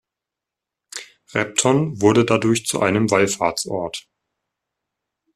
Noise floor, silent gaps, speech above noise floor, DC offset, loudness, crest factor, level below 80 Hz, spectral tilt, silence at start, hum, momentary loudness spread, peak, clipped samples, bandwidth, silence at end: -85 dBFS; none; 67 dB; under 0.1%; -19 LUFS; 20 dB; -56 dBFS; -4.5 dB/octave; 0.95 s; none; 18 LU; -2 dBFS; under 0.1%; 14.5 kHz; 1.35 s